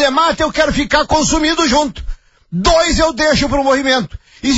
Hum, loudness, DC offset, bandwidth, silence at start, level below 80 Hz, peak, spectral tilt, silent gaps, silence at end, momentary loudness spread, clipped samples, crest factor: none; -13 LUFS; under 0.1%; 8 kHz; 0 s; -28 dBFS; -2 dBFS; -3.5 dB/octave; none; 0 s; 10 LU; under 0.1%; 12 dB